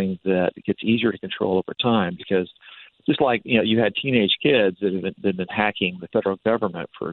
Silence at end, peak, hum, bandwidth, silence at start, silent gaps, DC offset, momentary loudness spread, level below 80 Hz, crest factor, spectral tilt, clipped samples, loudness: 0 s; -4 dBFS; none; 4.3 kHz; 0 s; none; under 0.1%; 7 LU; -60 dBFS; 18 dB; -9.5 dB/octave; under 0.1%; -22 LUFS